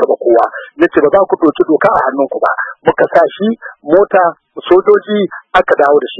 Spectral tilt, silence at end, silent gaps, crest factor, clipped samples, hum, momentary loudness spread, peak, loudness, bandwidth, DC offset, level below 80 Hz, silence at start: -7.5 dB/octave; 0 s; none; 10 dB; 0.4%; none; 7 LU; 0 dBFS; -11 LUFS; 6 kHz; under 0.1%; -48 dBFS; 0 s